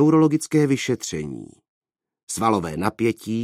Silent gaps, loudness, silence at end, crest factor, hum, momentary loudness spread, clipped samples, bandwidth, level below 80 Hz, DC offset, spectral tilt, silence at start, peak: 1.69-1.81 s, 2.23-2.27 s; -22 LUFS; 0 s; 18 dB; none; 13 LU; under 0.1%; 14.5 kHz; -54 dBFS; under 0.1%; -6 dB/octave; 0 s; -2 dBFS